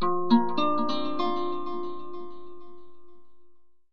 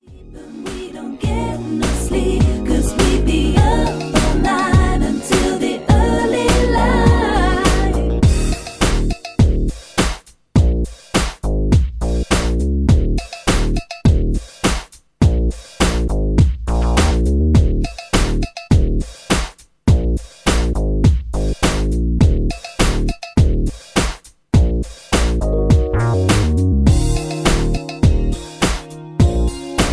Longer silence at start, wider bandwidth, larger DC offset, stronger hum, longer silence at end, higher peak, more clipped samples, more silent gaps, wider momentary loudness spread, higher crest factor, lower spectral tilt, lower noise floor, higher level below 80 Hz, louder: about the same, 0 s vs 0.1 s; second, 6.6 kHz vs 11 kHz; first, 3% vs under 0.1%; neither; about the same, 0 s vs 0 s; second, -8 dBFS vs 0 dBFS; neither; neither; first, 20 LU vs 8 LU; about the same, 20 dB vs 16 dB; first, -7 dB/octave vs -5.5 dB/octave; first, -54 dBFS vs -36 dBFS; second, -64 dBFS vs -18 dBFS; second, -27 LUFS vs -17 LUFS